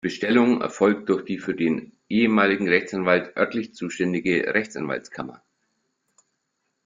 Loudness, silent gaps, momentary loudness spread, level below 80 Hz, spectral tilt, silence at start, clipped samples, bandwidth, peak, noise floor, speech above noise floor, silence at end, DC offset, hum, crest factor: -23 LUFS; none; 11 LU; -64 dBFS; -6 dB/octave; 0.05 s; under 0.1%; 7.6 kHz; -2 dBFS; -76 dBFS; 54 dB; 1.5 s; under 0.1%; none; 22 dB